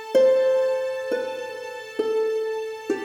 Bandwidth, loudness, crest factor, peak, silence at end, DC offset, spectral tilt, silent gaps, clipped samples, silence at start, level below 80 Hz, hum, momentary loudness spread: 14 kHz; -24 LUFS; 14 dB; -8 dBFS; 0 s; under 0.1%; -3.5 dB/octave; none; under 0.1%; 0 s; -76 dBFS; none; 14 LU